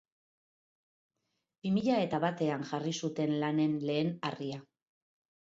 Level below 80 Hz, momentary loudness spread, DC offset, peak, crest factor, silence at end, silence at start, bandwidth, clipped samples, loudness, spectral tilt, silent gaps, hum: -76 dBFS; 10 LU; under 0.1%; -16 dBFS; 18 dB; 0.95 s; 1.65 s; 7.8 kHz; under 0.1%; -33 LUFS; -6 dB/octave; none; none